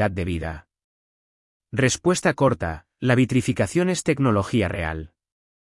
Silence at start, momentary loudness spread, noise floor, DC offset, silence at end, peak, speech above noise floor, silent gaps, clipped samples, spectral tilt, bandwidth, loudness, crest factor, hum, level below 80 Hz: 0 s; 11 LU; under -90 dBFS; under 0.1%; 0.6 s; -6 dBFS; over 68 dB; 0.84-1.60 s; under 0.1%; -5.5 dB/octave; 12 kHz; -22 LUFS; 18 dB; none; -46 dBFS